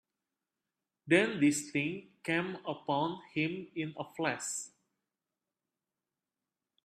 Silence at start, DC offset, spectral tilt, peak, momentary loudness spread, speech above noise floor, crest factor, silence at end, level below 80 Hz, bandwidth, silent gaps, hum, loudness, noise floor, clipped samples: 1.05 s; under 0.1%; -4 dB/octave; -12 dBFS; 12 LU; over 57 dB; 24 dB; 2.2 s; -78 dBFS; 14 kHz; none; none; -33 LUFS; under -90 dBFS; under 0.1%